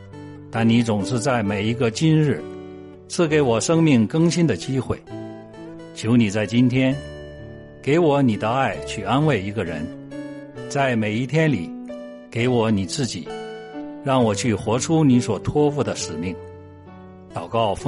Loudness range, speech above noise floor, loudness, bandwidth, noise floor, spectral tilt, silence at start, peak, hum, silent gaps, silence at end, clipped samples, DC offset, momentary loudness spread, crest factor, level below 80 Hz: 3 LU; 22 dB; -21 LUFS; 11.5 kHz; -42 dBFS; -6 dB/octave; 0 s; -6 dBFS; none; none; 0 s; under 0.1%; under 0.1%; 18 LU; 16 dB; -50 dBFS